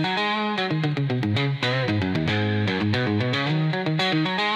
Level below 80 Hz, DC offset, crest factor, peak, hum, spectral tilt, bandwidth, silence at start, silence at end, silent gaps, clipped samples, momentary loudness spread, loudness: -60 dBFS; under 0.1%; 14 dB; -10 dBFS; none; -6.5 dB/octave; 9.6 kHz; 0 s; 0 s; none; under 0.1%; 2 LU; -23 LUFS